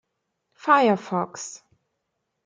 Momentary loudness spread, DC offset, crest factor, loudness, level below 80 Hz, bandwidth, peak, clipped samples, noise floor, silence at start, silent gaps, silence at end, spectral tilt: 17 LU; under 0.1%; 22 dB; -22 LUFS; -78 dBFS; 9.6 kHz; -4 dBFS; under 0.1%; -79 dBFS; 0.65 s; none; 0.9 s; -4.5 dB/octave